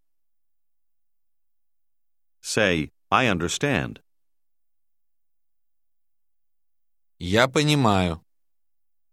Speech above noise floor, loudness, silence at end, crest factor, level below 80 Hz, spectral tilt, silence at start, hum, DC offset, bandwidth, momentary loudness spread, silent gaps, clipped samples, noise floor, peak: 67 dB; -22 LUFS; 0.95 s; 24 dB; -52 dBFS; -4.5 dB/octave; 2.45 s; none; under 0.1%; 14.5 kHz; 16 LU; none; under 0.1%; -89 dBFS; -2 dBFS